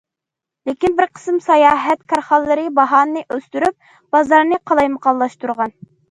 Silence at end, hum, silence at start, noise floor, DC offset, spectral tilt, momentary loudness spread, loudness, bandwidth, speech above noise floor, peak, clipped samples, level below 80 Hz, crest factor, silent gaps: 0.4 s; none; 0.65 s; -84 dBFS; under 0.1%; -5 dB/octave; 10 LU; -16 LUFS; 11.5 kHz; 69 dB; 0 dBFS; under 0.1%; -54 dBFS; 16 dB; none